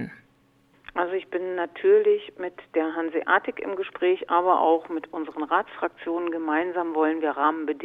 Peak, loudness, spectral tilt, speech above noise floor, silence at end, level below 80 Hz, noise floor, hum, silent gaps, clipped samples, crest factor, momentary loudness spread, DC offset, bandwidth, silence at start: -4 dBFS; -25 LUFS; -7 dB/octave; 37 dB; 0 s; -70 dBFS; -62 dBFS; none; none; under 0.1%; 20 dB; 11 LU; under 0.1%; 4.1 kHz; 0 s